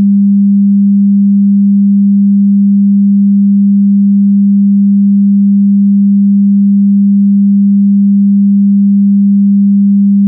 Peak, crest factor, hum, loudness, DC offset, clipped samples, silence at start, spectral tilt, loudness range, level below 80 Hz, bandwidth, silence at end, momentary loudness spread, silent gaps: -4 dBFS; 4 dB; none; -7 LUFS; under 0.1%; under 0.1%; 0 s; -23 dB/octave; 0 LU; -64 dBFS; 0.3 kHz; 0 s; 0 LU; none